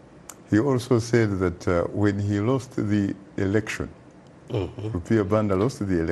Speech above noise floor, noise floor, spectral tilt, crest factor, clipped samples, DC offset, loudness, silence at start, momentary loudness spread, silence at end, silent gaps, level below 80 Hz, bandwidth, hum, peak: 23 dB; -46 dBFS; -7 dB/octave; 18 dB; under 0.1%; under 0.1%; -24 LUFS; 0.15 s; 10 LU; 0 s; none; -48 dBFS; 12.5 kHz; none; -6 dBFS